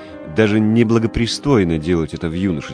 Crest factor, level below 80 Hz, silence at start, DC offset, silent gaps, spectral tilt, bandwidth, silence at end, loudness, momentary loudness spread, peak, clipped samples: 16 dB; -36 dBFS; 0 s; under 0.1%; none; -6.5 dB/octave; 10.5 kHz; 0 s; -17 LUFS; 7 LU; -2 dBFS; under 0.1%